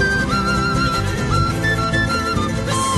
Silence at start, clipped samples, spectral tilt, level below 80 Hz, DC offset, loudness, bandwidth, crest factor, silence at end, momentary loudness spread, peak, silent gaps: 0 s; under 0.1%; -4.5 dB/octave; -30 dBFS; under 0.1%; -18 LUFS; 12.5 kHz; 12 dB; 0 s; 3 LU; -6 dBFS; none